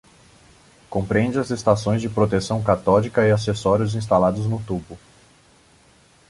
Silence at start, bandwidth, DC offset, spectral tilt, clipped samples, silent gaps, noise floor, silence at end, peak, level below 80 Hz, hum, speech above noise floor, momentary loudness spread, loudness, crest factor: 0.9 s; 11.5 kHz; under 0.1%; -7 dB/octave; under 0.1%; none; -54 dBFS; 1.3 s; -2 dBFS; -46 dBFS; none; 34 dB; 9 LU; -21 LUFS; 20 dB